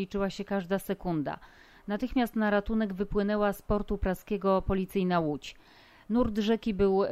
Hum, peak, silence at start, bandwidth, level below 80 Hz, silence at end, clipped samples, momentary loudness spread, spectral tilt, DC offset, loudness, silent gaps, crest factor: none; -14 dBFS; 0 s; 15.5 kHz; -44 dBFS; 0 s; under 0.1%; 7 LU; -7 dB/octave; under 0.1%; -30 LUFS; none; 14 dB